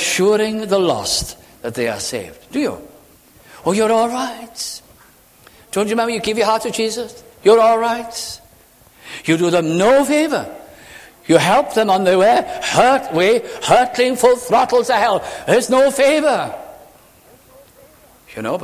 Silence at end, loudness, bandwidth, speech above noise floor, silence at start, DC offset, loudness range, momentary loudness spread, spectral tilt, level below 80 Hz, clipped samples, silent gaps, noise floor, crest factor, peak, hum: 0 s; -16 LUFS; 16 kHz; 33 dB; 0 s; under 0.1%; 7 LU; 15 LU; -4 dB/octave; -50 dBFS; under 0.1%; none; -48 dBFS; 16 dB; 0 dBFS; none